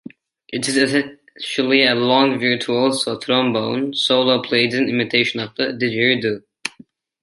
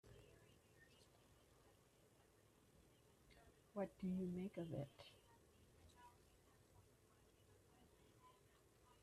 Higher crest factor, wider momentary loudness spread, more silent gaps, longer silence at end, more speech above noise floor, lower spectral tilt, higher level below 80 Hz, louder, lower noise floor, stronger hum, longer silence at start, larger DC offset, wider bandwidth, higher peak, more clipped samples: about the same, 18 dB vs 20 dB; second, 12 LU vs 21 LU; neither; first, 0.55 s vs 0.1 s; first, 30 dB vs 25 dB; second, -4 dB/octave vs -7.5 dB/octave; first, -66 dBFS vs -78 dBFS; first, -18 LUFS vs -50 LUFS; second, -48 dBFS vs -74 dBFS; neither; first, 0.5 s vs 0.05 s; neither; second, 11.5 kHz vs 14 kHz; first, -2 dBFS vs -36 dBFS; neither